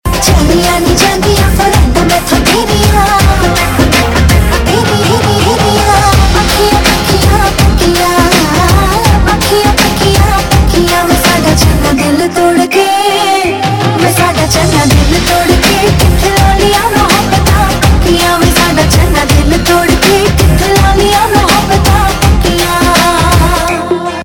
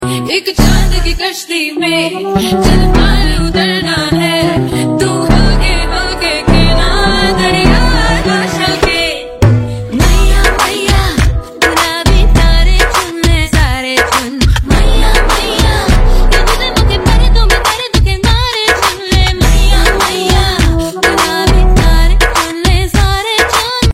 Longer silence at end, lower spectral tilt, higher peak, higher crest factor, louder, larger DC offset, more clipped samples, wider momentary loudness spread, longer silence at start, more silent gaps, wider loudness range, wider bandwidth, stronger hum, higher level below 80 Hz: about the same, 0 s vs 0 s; about the same, -4.5 dB/octave vs -4.5 dB/octave; about the same, 0 dBFS vs 0 dBFS; about the same, 8 dB vs 8 dB; first, -8 LUFS vs -11 LUFS; neither; first, 1% vs under 0.1%; about the same, 2 LU vs 4 LU; about the same, 0.05 s vs 0 s; neither; about the same, 1 LU vs 1 LU; first, 18.5 kHz vs 15.5 kHz; neither; about the same, -14 dBFS vs -12 dBFS